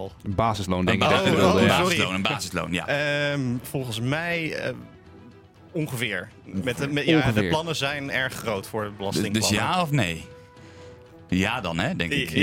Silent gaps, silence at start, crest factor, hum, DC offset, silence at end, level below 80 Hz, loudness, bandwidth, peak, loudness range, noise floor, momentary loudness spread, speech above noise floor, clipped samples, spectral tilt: none; 0 s; 20 dB; none; under 0.1%; 0 s; -52 dBFS; -24 LUFS; 16.5 kHz; -6 dBFS; 6 LU; -49 dBFS; 11 LU; 25 dB; under 0.1%; -4.5 dB/octave